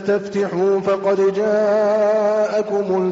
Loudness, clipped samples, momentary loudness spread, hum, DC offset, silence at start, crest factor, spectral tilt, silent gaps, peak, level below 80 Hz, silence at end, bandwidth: -18 LUFS; under 0.1%; 4 LU; none; under 0.1%; 0 s; 10 dB; -5.5 dB/octave; none; -8 dBFS; -62 dBFS; 0 s; 7.8 kHz